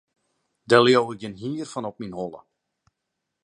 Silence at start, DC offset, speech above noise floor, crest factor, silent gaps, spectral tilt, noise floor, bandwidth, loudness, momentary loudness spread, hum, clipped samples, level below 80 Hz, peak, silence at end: 0.7 s; under 0.1%; 59 dB; 22 dB; none; -5 dB/octave; -81 dBFS; 11 kHz; -22 LUFS; 17 LU; none; under 0.1%; -66 dBFS; -2 dBFS; 1.05 s